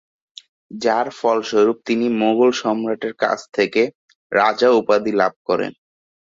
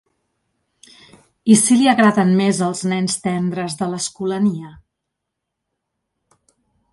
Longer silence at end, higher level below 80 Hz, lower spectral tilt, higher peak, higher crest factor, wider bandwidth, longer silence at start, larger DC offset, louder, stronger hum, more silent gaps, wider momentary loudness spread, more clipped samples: second, 0.7 s vs 2.2 s; about the same, -64 dBFS vs -60 dBFS; about the same, -4.5 dB/octave vs -4.5 dB/octave; about the same, -2 dBFS vs 0 dBFS; about the same, 16 dB vs 20 dB; second, 7.8 kHz vs 11.5 kHz; second, 0.7 s vs 1.45 s; neither; about the same, -19 LUFS vs -17 LUFS; neither; first, 3.95-4.08 s, 4.15-4.30 s, 5.36-5.45 s vs none; second, 7 LU vs 11 LU; neither